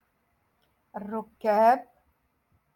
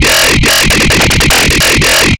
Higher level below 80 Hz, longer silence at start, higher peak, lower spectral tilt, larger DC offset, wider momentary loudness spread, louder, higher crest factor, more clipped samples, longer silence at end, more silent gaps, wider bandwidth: second, -74 dBFS vs -18 dBFS; first, 0.95 s vs 0 s; second, -10 dBFS vs 0 dBFS; first, -6.5 dB/octave vs -2.5 dB/octave; neither; first, 19 LU vs 1 LU; second, -25 LUFS vs -6 LUFS; first, 20 dB vs 8 dB; neither; first, 0.9 s vs 0.05 s; neither; about the same, 17.5 kHz vs 17.5 kHz